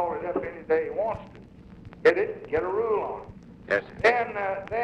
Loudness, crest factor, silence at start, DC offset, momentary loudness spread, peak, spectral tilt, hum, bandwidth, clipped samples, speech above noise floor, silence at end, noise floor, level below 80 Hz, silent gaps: -26 LUFS; 20 dB; 0 s; under 0.1%; 17 LU; -8 dBFS; -6 dB/octave; none; 8.8 kHz; under 0.1%; 20 dB; 0 s; -46 dBFS; -54 dBFS; none